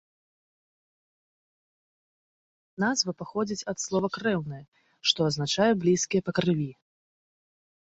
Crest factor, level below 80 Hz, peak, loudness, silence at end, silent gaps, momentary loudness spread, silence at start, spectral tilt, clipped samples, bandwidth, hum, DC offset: 24 dB; -66 dBFS; -6 dBFS; -27 LUFS; 1.1 s; 4.68-4.72 s; 8 LU; 2.8 s; -4 dB/octave; under 0.1%; 8.2 kHz; none; under 0.1%